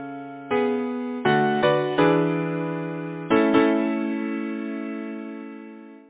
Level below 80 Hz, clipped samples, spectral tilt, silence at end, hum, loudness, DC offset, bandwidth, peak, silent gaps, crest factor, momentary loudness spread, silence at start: -62 dBFS; under 0.1%; -10.5 dB/octave; 0.1 s; none; -23 LUFS; under 0.1%; 4 kHz; -6 dBFS; none; 18 dB; 16 LU; 0 s